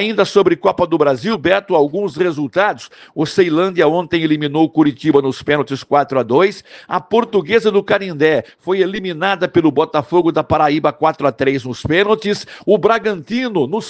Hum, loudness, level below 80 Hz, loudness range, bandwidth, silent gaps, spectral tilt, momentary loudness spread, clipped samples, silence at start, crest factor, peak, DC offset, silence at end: none; -15 LUFS; -52 dBFS; 1 LU; 9 kHz; none; -6 dB/octave; 5 LU; under 0.1%; 0 s; 16 dB; 0 dBFS; under 0.1%; 0 s